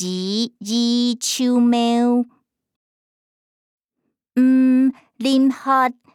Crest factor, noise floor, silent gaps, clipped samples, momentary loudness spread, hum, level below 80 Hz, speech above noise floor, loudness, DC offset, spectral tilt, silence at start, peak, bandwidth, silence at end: 14 dB; -76 dBFS; 2.76-3.78 s, 3.85-3.89 s; under 0.1%; 8 LU; none; -78 dBFS; 59 dB; -18 LUFS; under 0.1%; -4 dB/octave; 0 s; -6 dBFS; 14.5 kHz; 0.2 s